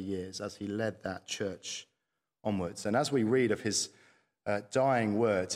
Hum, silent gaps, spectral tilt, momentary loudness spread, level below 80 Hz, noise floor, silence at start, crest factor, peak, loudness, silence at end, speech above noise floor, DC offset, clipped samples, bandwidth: none; none; -4.5 dB/octave; 12 LU; -70 dBFS; -86 dBFS; 0 s; 16 dB; -16 dBFS; -32 LUFS; 0 s; 54 dB; under 0.1%; under 0.1%; 15 kHz